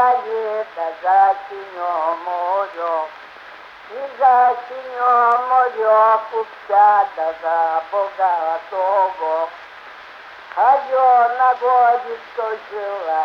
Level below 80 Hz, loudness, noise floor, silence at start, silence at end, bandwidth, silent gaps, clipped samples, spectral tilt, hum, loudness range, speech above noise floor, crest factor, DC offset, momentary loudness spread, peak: -68 dBFS; -17 LUFS; -39 dBFS; 0 s; 0 s; 6.2 kHz; none; under 0.1%; -3.5 dB/octave; none; 5 LU; 22 dB; 14 dB; under 0.1%; 18 LU; -4 dBFS